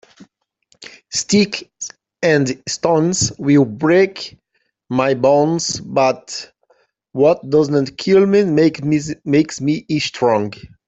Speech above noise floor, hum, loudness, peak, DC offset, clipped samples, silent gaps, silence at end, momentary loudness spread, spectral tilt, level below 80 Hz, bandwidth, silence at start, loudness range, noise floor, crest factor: 45 dB; none; -16 LUFS; -2 dBFS; under 0.1%; under 0.1%; none; 0.2 s; 12 LU; -5 dB/octave; -54 dBFS; 8.4 kHz; 0.8 s; 3 LU; -60 dBFS; 16 dB